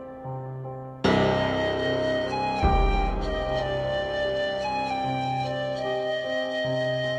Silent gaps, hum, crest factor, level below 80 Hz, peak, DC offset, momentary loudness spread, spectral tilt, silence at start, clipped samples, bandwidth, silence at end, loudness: none; none; 18 dB; -34 dBFS; -8 dBFS; under 0.1%; 8 LU; -6 dB/octave; 0 s; under 0.1%; 9.6 kHz; 0 s; -26 LUFS